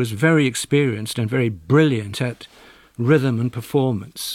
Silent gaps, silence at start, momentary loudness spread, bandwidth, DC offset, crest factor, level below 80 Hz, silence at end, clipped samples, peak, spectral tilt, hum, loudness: none; 0 s; 9 LU; 16 kHz; under 0.1%; 16 dB; -56 dBFS; 0 s; under 0.1%; -4 dBFS; -6 dB/octave; none; -20 LUFS